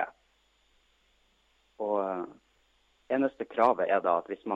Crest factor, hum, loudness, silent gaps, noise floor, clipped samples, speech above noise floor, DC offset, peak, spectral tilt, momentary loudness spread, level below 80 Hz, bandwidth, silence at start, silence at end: 22 dB; 50 Hz at -70 dBFS; -29 LUFS; none; -69 dBFS; under 0.1%; 42 dB; under 0.1%; -10 dBFS; -7 dB/octave; 12 LU; -74 dBFS; 7.6 kHz; 0 s; 0 s